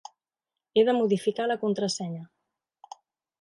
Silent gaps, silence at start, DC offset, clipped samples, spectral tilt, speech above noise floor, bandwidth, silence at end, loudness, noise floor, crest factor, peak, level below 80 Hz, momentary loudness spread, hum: none; 0.75 s; under 0.1%; under 0.1%; -5 dB/octave; 64 dB; 11.5 kHz; 1.15 s; -26 LUFS; -89 dBFS; 18 dB; -10 dBFS; -76 dBFS; 11 LU; none